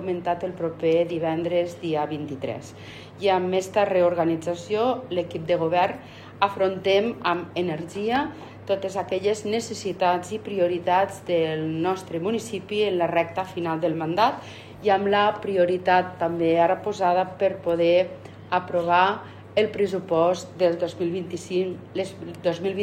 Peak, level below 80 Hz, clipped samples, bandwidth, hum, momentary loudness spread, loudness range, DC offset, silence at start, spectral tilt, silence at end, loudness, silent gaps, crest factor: -4 dBFS; -62 dBFS; under 0.1%; 14 kHz; none; 10 LU; 3 LU; under 0.1%; 0 s; -5.5 dB/octave; 0 s; -24 LUFS; none; 20 dB